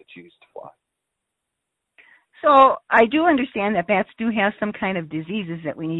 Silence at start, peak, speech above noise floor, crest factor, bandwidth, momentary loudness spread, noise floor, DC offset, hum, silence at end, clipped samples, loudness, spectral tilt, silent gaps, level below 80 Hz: 0.15 s; -2 dBFS; 60 dB; 18 dB; 4.1 kHz; 14 LU; -80 dBFS; under 0.1%; none; 0 s; under 0.1%; -19 LUFS; -8 dB/octave; none; -60 dBFS